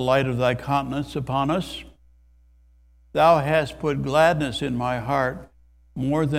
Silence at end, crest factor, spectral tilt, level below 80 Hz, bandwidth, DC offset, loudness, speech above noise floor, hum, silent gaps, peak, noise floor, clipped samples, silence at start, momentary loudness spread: 0 s; 20 dB; -6.5 dB/octave; -46 dBFS; 15 kHz; under 0.1%; -23 LUFS; 33 dB; none; none; -4 dBFS; -55 dBFS; under 0.1%; 0 s; 12 LU